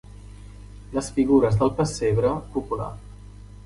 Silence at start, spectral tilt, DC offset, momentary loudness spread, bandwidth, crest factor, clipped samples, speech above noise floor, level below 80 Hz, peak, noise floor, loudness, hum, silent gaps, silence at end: 0.15 s; -7 dB/octave; under 0.1%; 25 LU; 11.5 kHz; 18 dB; under 0.1%; 20 dB; -42 dBFS; -6 dBFS; -42 dBFS; -23 LUFS; 50 Hz at -35 dBFS; none; 0.1 s